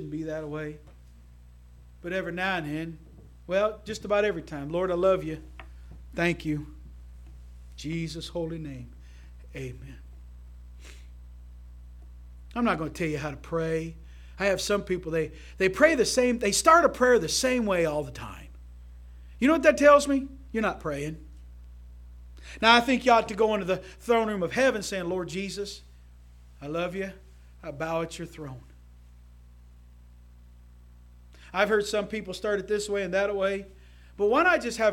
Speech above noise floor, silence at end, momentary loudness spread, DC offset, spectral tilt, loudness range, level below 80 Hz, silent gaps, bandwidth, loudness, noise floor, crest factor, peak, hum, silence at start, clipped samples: 25 dB; 0 s; 23 LU; under 0.1%; -4 dB/octave; 15 LU; -48 dBFS; none; 17 kHz; -26 LUFS; -51 dBFS; 24 dB; -4 dBFS; 60 Hz at -45 dBFS; 0 s; under 0.1%